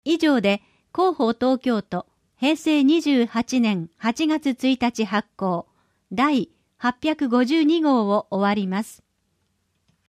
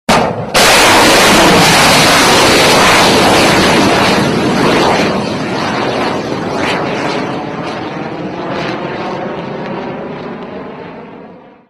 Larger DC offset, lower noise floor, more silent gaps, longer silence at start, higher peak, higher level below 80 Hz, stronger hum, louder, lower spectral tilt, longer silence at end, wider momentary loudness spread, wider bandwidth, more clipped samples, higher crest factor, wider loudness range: neither; first, -70 dBFS vs -35 dBFS; neither; about the same, 0.05 s vs 0.1 s; second, -8 dBFS vs 0 dBFS; second, -62 dBFS vs -36 dBFS; neither; second, -22 LUFS vs -9 LUFS; first, -5.5 dB/octave vs -3 dB/octave; first, 1.2 s vs 0.35 s; second, 9 LU vs 16 LU; about the same, 14.5 kHz vs 15.5 kHz; neither; about the same, 14 dB vs 10 dB; second, 2 LU vs 15 LU